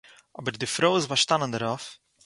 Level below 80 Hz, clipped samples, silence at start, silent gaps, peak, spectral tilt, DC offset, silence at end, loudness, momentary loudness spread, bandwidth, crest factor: -66 dBFS; under 0.1%; 0.4 s; none; -6 dBFS; -3 dB/octave; under 0.1%; 0.3 s; -25 LUFS; 12 LU; 11.5 kHz; 22 dB